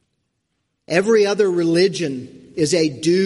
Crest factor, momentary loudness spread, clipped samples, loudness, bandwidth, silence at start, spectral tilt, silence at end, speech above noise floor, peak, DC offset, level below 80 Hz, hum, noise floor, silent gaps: 16 dB; 10 LU; under 0.1%; -18 LUFS; 11.5 kHz; 0.9 s; -5 dB/octave; 0 s; 56 dB; -2 dBFS; under 0.1%; -62 dBFS; none; -73 dBFS; none